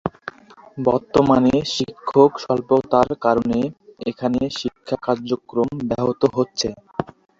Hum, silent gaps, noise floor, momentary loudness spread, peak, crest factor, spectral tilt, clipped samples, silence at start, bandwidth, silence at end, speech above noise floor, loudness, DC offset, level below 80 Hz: none; none; -38 dBFS; 14 LU; -2 dBFS; 18 dB; -6 dB/octave; under 0.1%; 0.05 s; 7.8 kHz; 0.35 s; 19 dB; -20 LUFS; under 0.1%; -50 dBFS